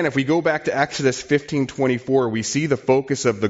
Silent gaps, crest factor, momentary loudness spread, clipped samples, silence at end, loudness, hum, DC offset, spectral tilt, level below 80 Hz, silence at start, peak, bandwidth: none; 16 dB; 3 LU; under 0.1%; 0 s; -20 LUFS; none; under 0.1%; -5 dB/octave; -56 dBFS; 0 s; -4 dBFS; 8 kHz